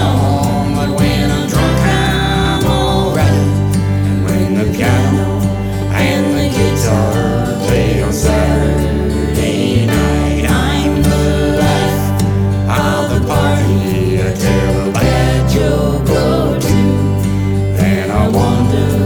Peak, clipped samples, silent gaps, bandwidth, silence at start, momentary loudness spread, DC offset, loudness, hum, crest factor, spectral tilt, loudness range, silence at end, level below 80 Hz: 0 dBFS; under 0.1%; none; 18.5 kHz; 0 s; 3 LU; under 0.1%; -13 LUFS; none; 12 dB; -6 dB/octave; 1 LU; 0 s; -22 dBFS